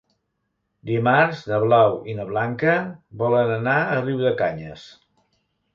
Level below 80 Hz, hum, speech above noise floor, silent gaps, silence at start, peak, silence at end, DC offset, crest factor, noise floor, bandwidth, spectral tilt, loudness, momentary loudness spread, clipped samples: -60 dBFS; none; 54 dB; none; 0.85 s; -4 dBFS; 0.85 s; under 0.1%; 18 dB; -75 dBFS; 7.2 kHz; -8 dB/octave; -21 LUFS; 12 LU; under 0.1%